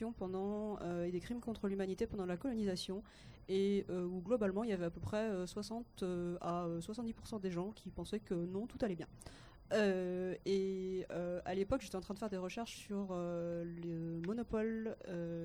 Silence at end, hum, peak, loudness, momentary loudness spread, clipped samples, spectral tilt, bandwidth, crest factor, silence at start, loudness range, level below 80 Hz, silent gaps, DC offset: 0 s; none; -22 dBFS; -41 LUFS; 8 LU; under 0.1%; -6.5 dB/octave; 19 kHz; 18 dB; 0 s; 3 LU; -62 dBFS; none; under 0.1%